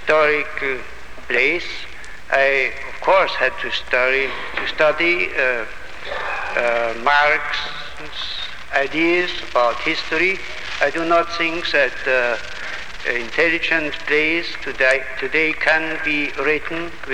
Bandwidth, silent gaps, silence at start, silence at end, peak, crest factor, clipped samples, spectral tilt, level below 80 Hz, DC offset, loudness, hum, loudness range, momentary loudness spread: 15.5 kHz; none; 0 s; 0 s; 0 dBFS; 20 dB; under 0.1%; -3.5 dB/octave; -44 dBFS; 3%; -19 LUFS; none; 2 LU; 12 LU